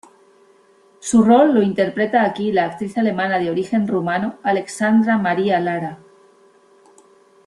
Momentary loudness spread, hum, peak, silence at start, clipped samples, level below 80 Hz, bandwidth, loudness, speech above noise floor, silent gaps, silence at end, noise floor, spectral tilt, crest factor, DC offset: 9 LU; none; -2 dBFS; 1.05 s; under 0.1%; -60 dBFS; 11.5 kHz; -18 LUFS; 36 dB; none; 1.5 s; -53 dBFS; -6 dB/octave; 18 dB; under 0.1%